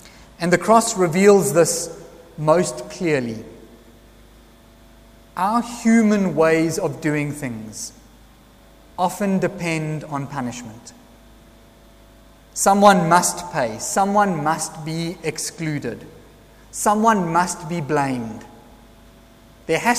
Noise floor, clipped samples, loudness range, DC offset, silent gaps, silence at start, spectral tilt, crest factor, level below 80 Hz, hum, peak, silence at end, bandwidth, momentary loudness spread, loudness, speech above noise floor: -48 dBFS; under 0.1%; 8 LU; under 0.1%; none; 0.05 s; -4.5 dB/octave; 20 dB; -52 dBFS; none; 0 dBFS; 0 s; 15.5 kHz; 17 LU; -19 LUFS; 29 dB